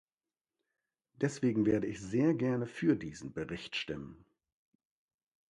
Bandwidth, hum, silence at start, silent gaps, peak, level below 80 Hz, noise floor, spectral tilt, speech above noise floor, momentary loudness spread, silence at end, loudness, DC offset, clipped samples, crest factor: 11 kHz; none; 1.2 s; none; -16 dBFS; -64 dBFS; under -90 dBFS; -6.5 dB/octave; over 57 dB; 12 LU; 1.35 s; -34 LUFS; under 0.1%; under 0.1%; 20 dB